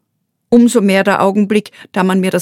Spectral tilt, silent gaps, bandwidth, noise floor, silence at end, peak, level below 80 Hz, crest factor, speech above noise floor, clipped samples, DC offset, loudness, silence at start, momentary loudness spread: -6 dB/octave; none; 16 kHz; -68 dBFS; 0 s; 0 dBFS; -56 dBFS; 12 dB; 57 dB; under 0.1%; under 0.1%; -12 LUFS; 0.5 s; 7 LU